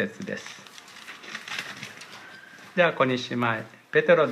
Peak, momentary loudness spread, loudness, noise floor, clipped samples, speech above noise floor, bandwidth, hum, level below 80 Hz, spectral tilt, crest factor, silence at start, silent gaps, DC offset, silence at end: -6 dBFS; 21 LU; -26 LUFS; -46 dBFS; under 0.1%; 22 dB; 14 kHz; none; -76 dBFS; -5 dB/octave; 20 dB; 0 s; none; under 0.1%; 0 s